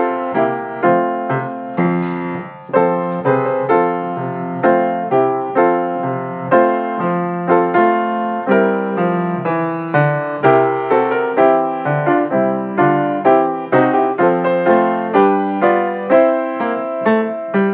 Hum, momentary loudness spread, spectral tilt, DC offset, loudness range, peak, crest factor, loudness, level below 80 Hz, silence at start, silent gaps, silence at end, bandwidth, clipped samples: none; 6 LU; -11 dB/octave; under 0.1%; 3 LU; -2 dBFS; 14 dB; -16 LUFS; -64 dBFS; 0 s; none; 0 s; 4 kHz; under 0.1%